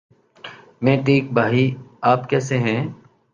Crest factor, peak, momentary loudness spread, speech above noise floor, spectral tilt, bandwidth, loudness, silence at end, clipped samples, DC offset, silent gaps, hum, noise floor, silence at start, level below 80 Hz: 18 dB; -2 dBFS; 21 LU; 23 dB; -7 dB/octave; 7.6 kHz; -20 LUFS; 0.4 s; under 0.1%; under 0.1%; none; none; -41 dBFS; 0.45 s; -60 dBFS